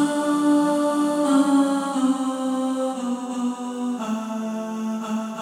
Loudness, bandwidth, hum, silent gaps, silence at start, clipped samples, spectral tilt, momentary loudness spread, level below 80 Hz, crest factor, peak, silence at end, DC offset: -23 LUFS; 14 kHz; none; none; 0 s; under 0.1%; -5 dB/octave; 9 LU; -74 dBFS; 14 dB; -8 dBFS; 0 s; under 0.1%